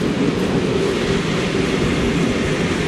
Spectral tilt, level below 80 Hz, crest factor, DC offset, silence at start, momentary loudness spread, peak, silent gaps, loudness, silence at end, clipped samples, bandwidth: -5.5 dB/octave; -34 dBFS; 14 dB; under 0.1%; 0 s; 1 LU; -4 dBFS; none; -19 LUFS; 0 s; under 0.1%; 13.5 kHz